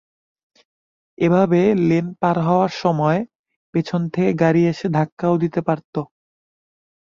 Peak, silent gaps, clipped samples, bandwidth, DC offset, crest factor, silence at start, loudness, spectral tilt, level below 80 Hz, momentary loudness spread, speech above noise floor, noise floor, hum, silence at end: -4 dBFS; 3.35-3.44 s, 3.56-3.73 s, 5.12-5.17 s, 5.85-5.93 s; under 0.1%; 7.2 kHz; under 0.1%; 16 dB; 1.2 s; -19 LUFS; -8.5 dB/octave; -58 dBFS; 9 LU; over 72 dB; under -90 dBFS; none; 1 s